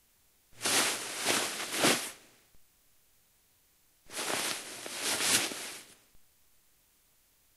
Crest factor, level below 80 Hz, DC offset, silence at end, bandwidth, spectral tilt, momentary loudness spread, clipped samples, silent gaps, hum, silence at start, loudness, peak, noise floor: 24 dB; -76 dBFS; under 0.1%; 1.35 s; 16 kHz; -0.5 dB/octave; 15 LU; under 0.1%; none; none; 0.55 s; -30 LUFS; -12 dBFS; -68 dBFS